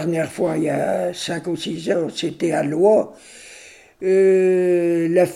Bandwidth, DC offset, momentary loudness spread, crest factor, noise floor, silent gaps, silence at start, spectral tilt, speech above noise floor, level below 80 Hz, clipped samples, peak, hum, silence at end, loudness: 12.5 kHz; under 0.1%; 11 LU; 16 dB; -44 dBFS; none; 0 s; -6 dB/octave; 25 dB; -62 dBFS; under 0.1%; -4 dBFS; none; 0 s; -19 LUFS